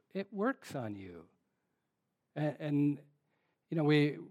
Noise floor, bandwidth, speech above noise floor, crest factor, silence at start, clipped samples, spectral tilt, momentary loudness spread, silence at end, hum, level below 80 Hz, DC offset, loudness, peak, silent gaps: -84 dBFS; 11 kHz; 51 dB; 18 dB; 0.15 s; under 0.1%; -7.5 dB/octave; 16 LU; 0 s; none; -84 dBFS; under 0.1%; -35 LUFS; -18 dBFS; none